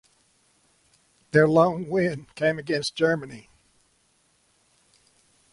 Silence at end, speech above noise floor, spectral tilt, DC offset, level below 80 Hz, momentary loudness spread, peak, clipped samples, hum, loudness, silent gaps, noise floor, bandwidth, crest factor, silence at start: 2.15 s; 43 dB; -6 dB/octave; under 0.1%; -62 dBFS; 10 LU; -6 dBFS; under 0.1%; none; -23 LUFS; none; -66 dBFS; 11.5 kHz; 20 dB; 1.35 s